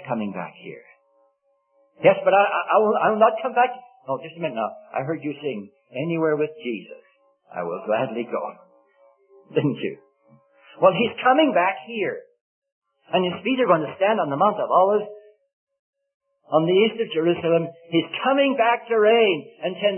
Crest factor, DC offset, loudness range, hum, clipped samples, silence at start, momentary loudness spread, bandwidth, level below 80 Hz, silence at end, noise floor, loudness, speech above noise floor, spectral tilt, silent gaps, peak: 20 dB; under 0.1%; 7 LU; none; under 0.1%; 0 s; 13 LU; 3.4 kHz; -76 dBFS; 0 s; -67 dBFS; -22 LUFS; 46 dB; -10.5 dB/octave; 12.41-12.62 s, 12.72-12.82 s, 15.53-15.67 s, 15.79-15.93 s, 16.14-16.20 s; -4 dBFS